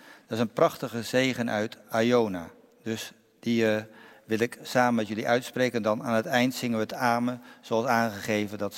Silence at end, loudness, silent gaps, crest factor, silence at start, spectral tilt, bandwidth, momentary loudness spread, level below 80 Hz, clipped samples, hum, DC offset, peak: 0 s; -27 LUFS; none; 20 dB; 0.05 s; -5 dB/octave; 16.5 kHz; 11 LU; -72 dBFS; under 0.1%; none; under 0.1%; -6 dBFS